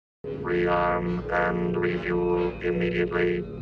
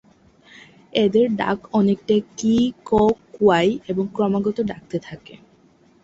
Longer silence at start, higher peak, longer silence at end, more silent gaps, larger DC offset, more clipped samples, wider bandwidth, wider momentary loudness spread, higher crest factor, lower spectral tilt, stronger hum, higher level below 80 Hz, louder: second, 0.25 s vs 0.95 s; second, -12 dBFS vs -4 dBFS; second, 0 s vs 0.85 s; neither; neither; neither; second, 6.2 kHz vs 7.8 kHz; second, 4 LU vs 11 LU; about the same, 14 dB vs 16 dB; first, -8.5 dB/octave vs -6.5 dB/octave; neither; first, -44 dBFS vs -52 dBFS; second, -26 LUFS vs -20 LUFS